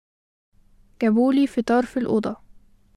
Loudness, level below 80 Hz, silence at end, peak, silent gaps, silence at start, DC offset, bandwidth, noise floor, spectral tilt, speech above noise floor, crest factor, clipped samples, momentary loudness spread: -21 LUFS; -56 dBFS; 0.6 s; -8 dBFS; none; 1 s; under 0.1%; 11.5 kHz; -51 dBFS; -7 dB/octave; 30 dB; 16 dB; under 0.1%; 9 LU